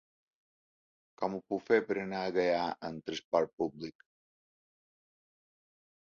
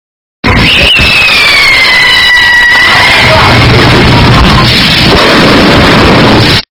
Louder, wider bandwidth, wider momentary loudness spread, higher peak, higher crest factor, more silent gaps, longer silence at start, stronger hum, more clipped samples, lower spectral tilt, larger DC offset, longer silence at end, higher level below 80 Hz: second, -33 LUFS vs -2 LUFS; second, 7.2 kHz vs over 20 kHz; first, 11 LU vs 2 LU; second, -12 dBFS vs 0 dBFS; first, 24 dB vs 4 dB; first, 3.25-3.32 s, 3.53-3.57 s vs none; first, 1.2 s vs 0.45 s; neither; second, under 0.1% vs 10%; about the same, -3.5 dB/octave vs -4.5 dB/octave; neither; first, 2.2 s vs 0.1 s; second, -74 dBFS vs -18 dBFS